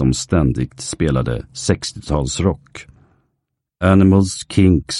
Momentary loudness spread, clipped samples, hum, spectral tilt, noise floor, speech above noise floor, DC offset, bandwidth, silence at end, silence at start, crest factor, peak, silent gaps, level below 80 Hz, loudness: 11 LU; under 0.1%; none; -6 dB/octave; -75 dBFS; 58 dB; under 0.1%; 11.5 kHz; 0 s; 0 s; 16 dB; 0 dBFS; none; -32 dBFS; -17 LUFS